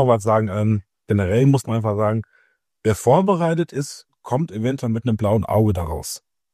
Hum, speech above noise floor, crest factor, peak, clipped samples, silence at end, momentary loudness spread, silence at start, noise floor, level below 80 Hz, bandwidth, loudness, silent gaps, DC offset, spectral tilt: none; 43 dB; 18 dB; -2 dBFS; under 0.1%; 0.35 s; 11 LU; 0 s; -62 dBFS; -48 dBFS; 15 kHz; -20 LUFS; none; under 0.1%; -7 dB/octave